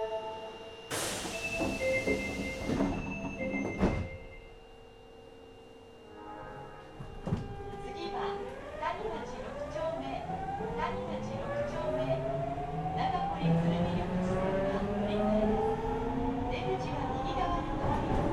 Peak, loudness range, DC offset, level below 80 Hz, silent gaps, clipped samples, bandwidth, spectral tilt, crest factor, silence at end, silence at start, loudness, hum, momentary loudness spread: -14 dBFS; 10 LU; under 0.1%; -46 dBFS; none; under 0.1%; 15 kHz; -6 dB/octave; 20 dB; 0 s; 0 s; -34 LUFS; none; 18 LU